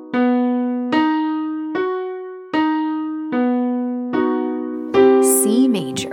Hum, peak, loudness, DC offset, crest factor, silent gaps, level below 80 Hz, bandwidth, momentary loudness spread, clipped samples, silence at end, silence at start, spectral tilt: none; -2 dBFS; -18 LUFS; under 0.1%; 16 dB; none; -62 dBFS; 16.5 kHz; 10 LU; under 0.1%; 0 s; 0 s; -4 dB/octave